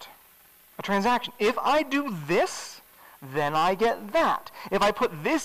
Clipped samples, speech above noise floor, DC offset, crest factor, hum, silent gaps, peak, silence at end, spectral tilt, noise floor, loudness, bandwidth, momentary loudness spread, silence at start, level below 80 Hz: under 0.1%; 30 dB; 0.4%; 10 dB; none; none; -16 dBFS; 0 s; -4.5 dB/octave; -56 dBFS; -25 LUFS; 16 kHz; 13 LU; 0 s; -56 dBFS